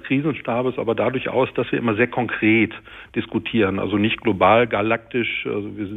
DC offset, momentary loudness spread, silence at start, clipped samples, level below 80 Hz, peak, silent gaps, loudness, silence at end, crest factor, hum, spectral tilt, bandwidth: under 0.1%; 9 LU; 0 s; under 0.1%; -54 dBFS; -2 dBFS; none; -20 LUFS; 0 s; 18 dB; none; -8.5 dB/octave; 4 kHz